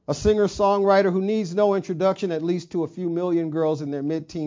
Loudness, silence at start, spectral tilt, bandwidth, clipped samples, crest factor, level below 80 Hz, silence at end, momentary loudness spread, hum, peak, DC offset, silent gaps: -22 LUFS; 0.1 s; -6.5 dB/octave; 7.6 kHz; under 0.1%; 16 dB; -46 dBFS; 0 s; 8 LU; none; -6 dBFS; under 0.1%; none